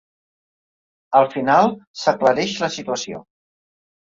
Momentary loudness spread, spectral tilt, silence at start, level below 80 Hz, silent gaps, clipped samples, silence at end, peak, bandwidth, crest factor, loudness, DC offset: 10 LU; -4 dB/octave; 1.1 s; -64 dBFS; 1.87-1.94 s; under 0.1%; 0.9 s; -2 dBFS; 7.8 kHz; 20 dB; -19 LUFS; under 0.1%